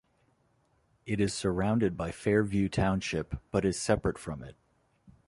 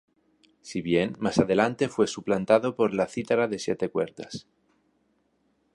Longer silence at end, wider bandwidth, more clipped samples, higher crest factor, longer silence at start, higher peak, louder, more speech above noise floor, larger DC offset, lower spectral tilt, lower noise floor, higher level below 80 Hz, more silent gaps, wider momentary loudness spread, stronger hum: second, 0.75 s vs 1.35 s; about the same, 11.5 kHz vs 11.5 kHz; neither; about the same, 20 dB vs 22 dB; first, 1.05 s vs 0.65 s; second, -12 dBFS vs -6 dBFS; second, -30 LUFS vs -26 LUFS; second, 41 dB vs 45 dB; neither; about the same, -6 dB/octave vs -5.5 dB/octave; about the same, -70 dBFS vs -70 dBFS; first, -48 dBFS vs -60 dBFS; neither; about the same, 12 LU vs 12 LU; neither